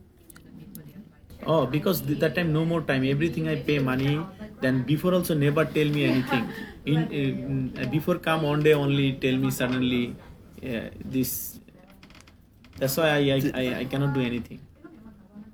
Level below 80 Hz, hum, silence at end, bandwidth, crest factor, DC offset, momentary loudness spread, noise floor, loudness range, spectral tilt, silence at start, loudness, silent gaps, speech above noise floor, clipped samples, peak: -52 dBFS; none; 0.05 s; over 20 kHz; 18 dB; under 0.1%; 12 LU; -53 dBFS; 4 LU; -6 dB/octave; 0.55 s; -25 LUFS; none; 28 dB; under 0.1%; -8 dBFS